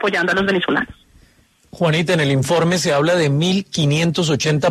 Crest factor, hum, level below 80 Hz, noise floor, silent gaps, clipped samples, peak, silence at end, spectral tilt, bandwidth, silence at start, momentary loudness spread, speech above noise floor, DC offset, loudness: 14 dB; none; -50 dBFS; -54 dBFS; none; under 0.1%; -4 dBFS; 0 s; -5 dB/octave; 13.5 kHz; 0 s; 3 LU; 37 dB; under 0.1%; -17 LUFS